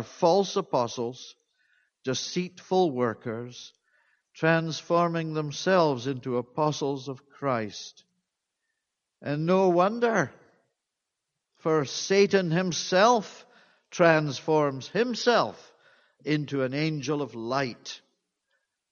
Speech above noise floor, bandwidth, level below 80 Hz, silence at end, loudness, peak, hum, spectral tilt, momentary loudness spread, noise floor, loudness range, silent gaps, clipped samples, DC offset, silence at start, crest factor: 59 dB; 7.2 kHz; -72 dBFS; 0.95 s; -26 LUFS; -4 dBFS; none; -5 dB/octave; 16 LU; -85 dBFS; 7 LU; none; under 0.1%; under 0.1%; 0 s; 22 dB